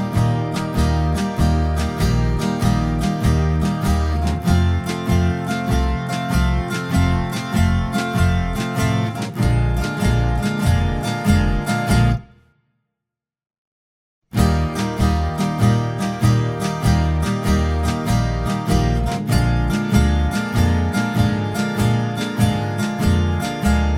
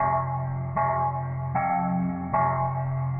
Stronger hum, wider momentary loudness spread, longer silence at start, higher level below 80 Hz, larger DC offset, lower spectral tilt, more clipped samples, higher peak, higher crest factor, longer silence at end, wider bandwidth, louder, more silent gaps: neither; about the same, 4 LU vs 4 LU; about the same, 0 s vs 0 s; first, -24 dBFS vs -56 dBFS; neither; second, -6.5 dB/octave vs -14 dB/octave; neither; first, -2 dBFS vs -12 dBFS; about the same, 16 dB vs 14 dB; about the same, 0 s vs 0 s; first, 16.5 kHz vs 2.8 kHz; first, -19 LUFS vs -27 LUFS; first, 13.58-14.22 s vs none